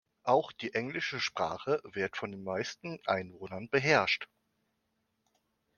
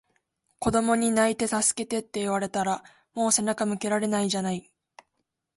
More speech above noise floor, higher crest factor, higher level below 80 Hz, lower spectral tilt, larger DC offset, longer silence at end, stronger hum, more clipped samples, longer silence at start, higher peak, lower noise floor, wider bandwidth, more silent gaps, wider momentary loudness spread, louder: second, 47 dB vs 54 dB; first, 24 dB vs 18 dB; second, -72 dBFS vs -58 dBFS; about the same, -4.5 dB/octave vs -3.5 dB/octave; neither; first, 1.55 s vs 0.95 s; neither; neither; second, 0.25 s vs 0.6 s; about the same, -10 dBFS vs -8 dBFS; about the same, -80 dBFS vs -79 dBFS; second, 7.2 kHz vs 12 kHz; neither; first, 12 LU vs 8 LU; second, -32 LUFS vs -26 LUFS